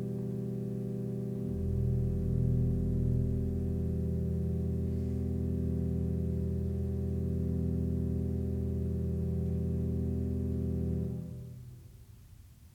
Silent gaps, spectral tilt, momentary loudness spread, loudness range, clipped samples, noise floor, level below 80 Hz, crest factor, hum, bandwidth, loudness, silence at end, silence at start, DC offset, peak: none; -11 dB/octave; 5 LU; 2 LU; under 0.1%; -54 dBFS; -44 dBFS; 14 dB; none; 2.7 kHz; -34 LUFS; 0.05 s; 0 s; under 0.1%; -20 dBFS